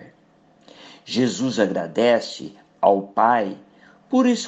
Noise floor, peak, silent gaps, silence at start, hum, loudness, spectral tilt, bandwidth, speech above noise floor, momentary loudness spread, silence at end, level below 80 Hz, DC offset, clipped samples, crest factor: -56 dBFS; 0 dBFS; none; 0 s; none; -21 LUFS; -5 dB/octave; 8.4 kHz; 36 dB; 16 LU; 0 s; -68 dBFS; under 0.1%; under 0.1%; 20 dB